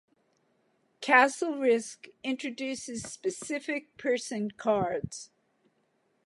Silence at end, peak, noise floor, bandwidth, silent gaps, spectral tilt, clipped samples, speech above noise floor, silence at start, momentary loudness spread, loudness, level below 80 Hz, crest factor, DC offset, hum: 1 s; -8 dBFS; -73 dBFS; 11.5 kHz; none; -3.5 dB/octave; under 0.1%; 43 dB; 1 s; 16 LU; -29 LUFS; -66 dBFS; 24 dB; under 0.1%; none